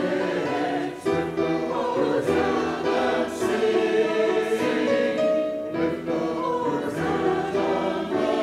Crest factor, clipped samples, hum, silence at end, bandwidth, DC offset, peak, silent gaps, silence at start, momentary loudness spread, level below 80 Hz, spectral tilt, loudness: 14 dB; under 0.1%; none; 0 s; 15 kHz; under 0.1%; -10 dBFS; none; 0 s; 4 LU; -56 dBFS; -5.5 dB/octave; -24 LUFS